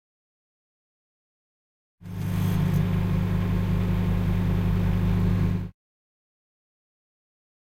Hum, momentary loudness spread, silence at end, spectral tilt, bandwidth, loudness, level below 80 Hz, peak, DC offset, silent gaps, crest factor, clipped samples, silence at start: 50 Hz at -30 dBFS; 6 LU; 2.05 s; -8.5 dB/octave; 16 kHz; -25 LUFS; -34 dBFS; -12 dBFS; under 0.1%; none; 14 dB; under 0.1%; 2 s